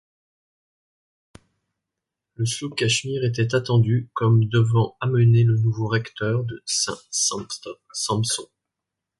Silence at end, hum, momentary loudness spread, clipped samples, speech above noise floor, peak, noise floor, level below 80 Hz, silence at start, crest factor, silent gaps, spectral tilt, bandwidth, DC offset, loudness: 0.75 s; none; 10 LU; under 0.1%; 63 dB; -8 dBFS; -85 dBFS; -56 dBFS; 2.4 s; 16 dB; none; -4.5 dB/octave; 11.5 kHz; under 0.1%; -22 LUFS